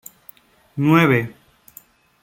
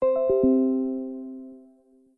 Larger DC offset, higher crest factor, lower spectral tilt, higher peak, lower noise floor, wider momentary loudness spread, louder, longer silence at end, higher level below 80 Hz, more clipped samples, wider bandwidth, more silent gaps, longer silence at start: neither; first, 20 dB vs 14 dB; second, -7 dB/octave vs -11.5 dB/octave; first, -2 dBFS vs -12 dBFS; second, -49 dBFS vs -58 dBFS; about the same, 21 LU vs 20 LU; first, -17 LUFS vs -24 LUFS; first, 0.9 s vs 0.55 s; about the same, -58 dBFS vs -56 dBFS; neither; first, 17 kHz vs 2.8 kHz; neither; first, 0.75 s vs 0 s